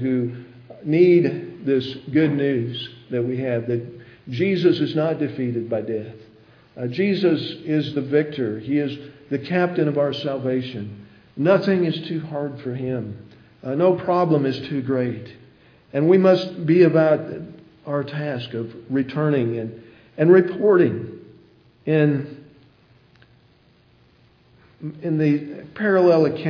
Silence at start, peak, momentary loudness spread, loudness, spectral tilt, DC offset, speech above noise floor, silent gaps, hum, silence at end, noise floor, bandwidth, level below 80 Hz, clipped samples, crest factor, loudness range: 0 s; -2 dBFS; 18 LU; -21 LUFS; -9 dB/octave; under 0.1%; 36 dB; none; none; 0 s; -56 dBFS; 5.4 kHz; -66 dBFS; under 0.1%; 20 dB; 6 LU